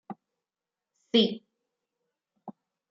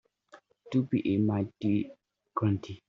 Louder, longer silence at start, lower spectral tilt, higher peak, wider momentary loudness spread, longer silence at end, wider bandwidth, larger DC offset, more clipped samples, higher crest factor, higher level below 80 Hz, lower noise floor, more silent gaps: first, -26 LUFS vs -30 LUFS; second, 0.1 s vs 0.35 s; second, -6 dB/octave vs -8 dB/octave; first, -10 dBFS vs -16 dBFS; first, 25 LU vs 5 LU; first, 0.4 s vs 0.1 s; about the same, 7.4 kHz vs 7.2 kHz; neither; neither; first, 24 dB vs 16 dB; second, -80 dBFS vs -68 dBFS; first, under -90 dBFS vs -59 dBFS; neither